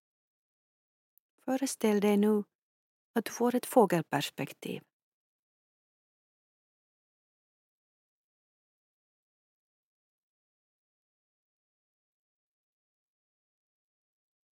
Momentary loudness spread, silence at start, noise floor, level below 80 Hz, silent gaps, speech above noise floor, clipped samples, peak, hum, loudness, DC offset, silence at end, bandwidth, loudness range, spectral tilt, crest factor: 16 LU; 1.45 s; under -90 dBFS; under -90 dBFS; 2.55-3.14 s; over 61 dB; under 0.1%; -10 dBFS; none; -30 LUFS; under 0.1%; 9.75 s; 16.5 kHz; 13 LU; -5.5 dB/octave; 26 dB